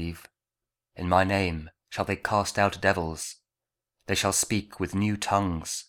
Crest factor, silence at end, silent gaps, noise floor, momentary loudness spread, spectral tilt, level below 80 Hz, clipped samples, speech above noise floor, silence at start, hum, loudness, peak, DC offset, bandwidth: 22 dB; 0.05 s; none; -89 dBFS; 14 LU; -4 dB/octave; -50 dBFS; under 0.1%; 63 dB; 0 s; none; -27 LUFS; -6 dBFS; under 0.1%; 18.5 kHz